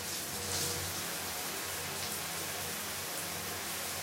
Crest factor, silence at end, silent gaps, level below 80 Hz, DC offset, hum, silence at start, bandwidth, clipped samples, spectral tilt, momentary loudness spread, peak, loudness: 16 dB; 0 s; none; -64 dBFS; under 0.1%; none; 0 s; 16 kHz; under 0.1%; -1.5 dB/octave; 3 LU; -22 dBFS; -36 LUFS